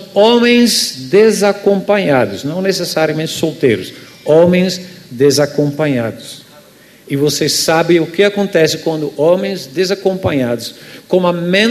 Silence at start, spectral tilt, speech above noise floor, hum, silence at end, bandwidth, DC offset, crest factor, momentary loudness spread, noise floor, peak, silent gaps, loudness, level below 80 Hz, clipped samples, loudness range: 0 s; -4.5 dB/octave; 29 dB; none; 0 s; 14 kHz; under 0.1%; 14 dB; 11 LU; -42 dBFS; 0 dBFS; none; -13 LUFS; -52 dBFS; under 0.1%; 3 LU